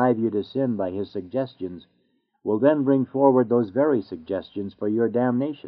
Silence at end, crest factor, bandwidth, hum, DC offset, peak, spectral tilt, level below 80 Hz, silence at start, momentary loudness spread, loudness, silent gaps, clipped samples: 0 s; 18 dB; 5.2 kHz; none; under 0.1%; -4 dBFS; -7.5 dB/octave; -68 dBFS; 0 s; 13 LU; -23 LUFS; none; under 0.1%